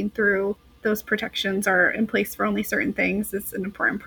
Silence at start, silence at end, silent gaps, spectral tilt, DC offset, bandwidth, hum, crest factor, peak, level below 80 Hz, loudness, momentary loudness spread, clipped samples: 0 s; 0 s; none; -4.5 dB/octave; under 0.1%; 19 kHz; none; 18 dB; -6 dBFS; -52 dBFS; -24 LUFS; 9 LU; under 0.1%